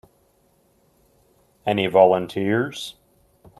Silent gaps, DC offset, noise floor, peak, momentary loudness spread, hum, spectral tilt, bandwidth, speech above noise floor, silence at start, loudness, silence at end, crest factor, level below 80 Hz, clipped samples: none; under 0.1%; -62 dBFS; -2 dBFS; 16 LU; none; -6 dB/octave; 13.5 kHz; 43 dB; 1.65 s; -20 LUFS; 0.7 s; 22 dB; -62 dBFS; under 0.1%